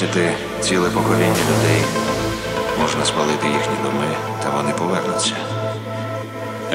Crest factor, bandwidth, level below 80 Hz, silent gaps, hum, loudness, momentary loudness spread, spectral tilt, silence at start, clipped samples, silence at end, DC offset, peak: 16 dB; 16 kHz; -44 dBFS; none; none; -19 LUFS; 9 LU; -4.5 dB/octave; 0 s; under 0.1%; 0 s; under 0.1%; -2 dBFS